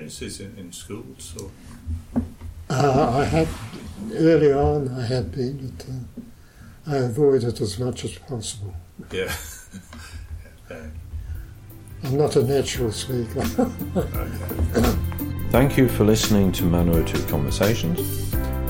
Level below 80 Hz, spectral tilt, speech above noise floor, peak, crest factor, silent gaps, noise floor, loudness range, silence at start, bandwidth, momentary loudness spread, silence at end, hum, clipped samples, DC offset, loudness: -34 dBFS; -6 dB/octave; 23 dB; -4 dBFS; 18 dB; none; -45 dBFS; 11 LU; 0 s; 17 kHz; 20 LU; 0 s; none; under 0.1%; under 0.1%; -22 LUFS